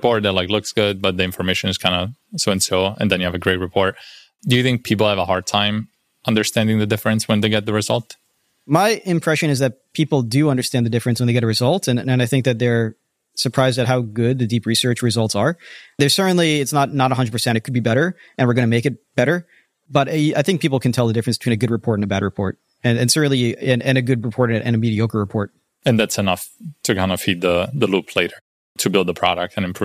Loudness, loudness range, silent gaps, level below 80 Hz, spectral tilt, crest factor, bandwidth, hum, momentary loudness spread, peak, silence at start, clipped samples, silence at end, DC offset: -19 LUFS; 2 LU; 28.41-28.75 s; -54 dBFS; -5 dB/octave; 18 dB; 15.5 kHz; none; 6 LU; -2 dBFS; 0 s; under 0.1%; 0 s; under 0.1%